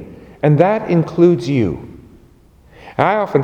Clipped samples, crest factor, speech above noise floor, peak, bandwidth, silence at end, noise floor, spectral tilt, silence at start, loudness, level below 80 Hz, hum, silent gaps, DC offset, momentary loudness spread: under 0.1%; 16 dB; 33 dB; 0 dBFS; 8.8 kHz; 0 s; -47 dBFS; -8.5 dB/octave; 0 s; -15 LUFS; -46 dBFS; none; none; under 0.1%; 9 LU